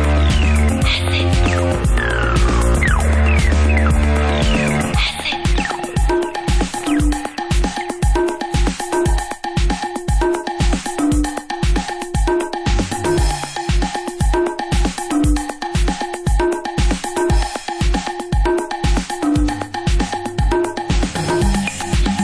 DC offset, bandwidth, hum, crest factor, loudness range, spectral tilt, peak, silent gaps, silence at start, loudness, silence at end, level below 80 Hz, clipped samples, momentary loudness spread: under 0.1%; 11 kHz; none; 12 dB; 4 LU; -5 dB/octave; -4 dBFS; none; 0 s; -18 LUFS; 0 s; -20 dBFS; under 0.1%; 6 LU